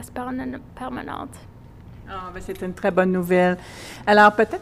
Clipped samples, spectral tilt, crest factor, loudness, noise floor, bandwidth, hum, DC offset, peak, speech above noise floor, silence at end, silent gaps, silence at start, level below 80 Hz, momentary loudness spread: under 0.1%; -6 dB/octave; 20 dB; -20 LUFS; -42 dBFS; 15 kHz; none; under 0.1%; -2 dBFS; 21 dB; 0 s; none; 0 s; -48 dBFS; 20 LU